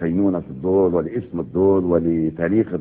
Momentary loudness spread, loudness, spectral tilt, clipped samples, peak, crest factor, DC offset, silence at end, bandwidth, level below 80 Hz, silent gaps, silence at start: 8 LU; -20 LUFS; -13.5 dB/octave; under 0.1%; -4 dBFS; 14 dB; under 0.1%; 0 s; 3.5 kHz; -48 dBFS; none; 0 s